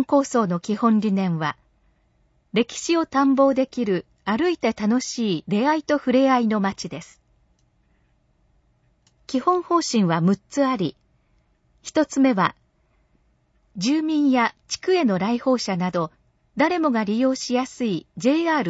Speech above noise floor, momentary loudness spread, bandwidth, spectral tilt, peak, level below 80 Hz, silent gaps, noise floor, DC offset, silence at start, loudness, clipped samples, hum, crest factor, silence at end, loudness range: 43 dB; 8 LU; 8 kHz; -5.5 dB/octave; -4 dBFS; -62 dBFS; none; -64 dBFS; under 0.1%; 0 s; -22 LUFS; under 0.1%; none; 18 dB; 0 s; 4 LU